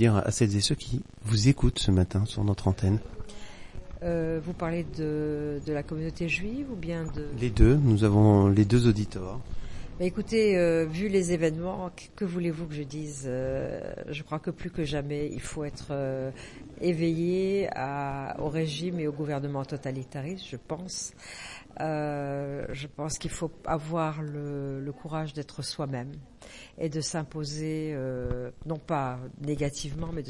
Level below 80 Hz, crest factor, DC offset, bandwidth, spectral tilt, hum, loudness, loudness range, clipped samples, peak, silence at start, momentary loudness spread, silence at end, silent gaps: -42 dBFS; 22 dB; under 0.1%; 11.5 kHz; -6 dB/octave; none; -29 LUFS; 10 LU; under 0.1%; -6 dBFS; 0 s; 14 LU; 0 s; none